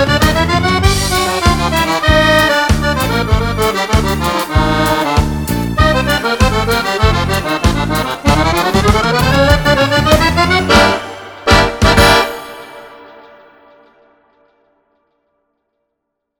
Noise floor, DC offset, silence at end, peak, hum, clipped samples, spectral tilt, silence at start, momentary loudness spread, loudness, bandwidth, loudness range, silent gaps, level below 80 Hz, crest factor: -74 dBFS; under 0.1%; 3.35 s; 0 dBFS; none; under 0.1%; -4.5 dB/octave; 0 s; 6 LU; -12 LUFS; over 20 kHz; 3 LU; none; -22 dBFS; 12 dB